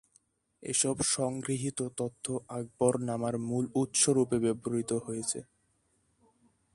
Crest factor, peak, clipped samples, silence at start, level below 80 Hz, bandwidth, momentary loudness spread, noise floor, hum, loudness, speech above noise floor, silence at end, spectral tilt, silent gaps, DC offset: 20 dB; -12 dBFS; under 0.1%; 0.6 s; -66 dBFS; 11.5 kHz; 10 LU; -73 dBFS; none; -31 LUFS; 42 dB; 1.3 s; -4 dB/octave; none; under 0.1%